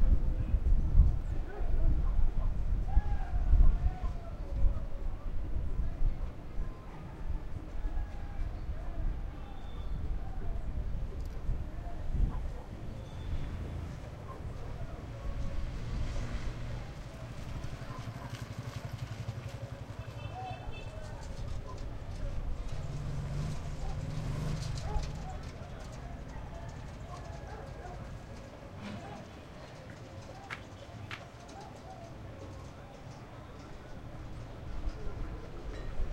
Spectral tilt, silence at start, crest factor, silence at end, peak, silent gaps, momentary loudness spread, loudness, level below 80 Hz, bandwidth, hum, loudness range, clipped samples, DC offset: -7 dB/octave; 0 s; 22 dB; 0 s; -12 dBFS; none; 13 LU; -40 LUFS; -34 dBFS; 8.6 kHz; none; 12 LU; under 0.1%; under 0.1%